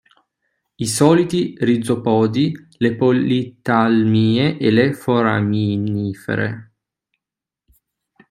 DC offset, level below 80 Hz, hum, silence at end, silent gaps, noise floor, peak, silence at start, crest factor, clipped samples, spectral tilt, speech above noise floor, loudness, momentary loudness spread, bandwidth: under 0.1%; -58 dBFS; none; 1.65 s; none; -87 dBFS; 0 dBFS; 0.8 s; 18 dB; under 0.1%; -6 dB/octave; 70 dB; -17 LUFS; 8 LU; 14 kHz